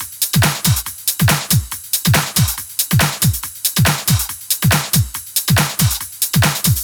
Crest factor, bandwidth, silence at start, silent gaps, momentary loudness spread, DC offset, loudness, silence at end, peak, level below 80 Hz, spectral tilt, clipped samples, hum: 16 dB; over 20 kHz; 0 s; none; 5 LU; under 0.1%; -15 LUFS; 0 s; 0 dBFS; -34 dBFS; -3.5 dB/octave; under 0.1%; none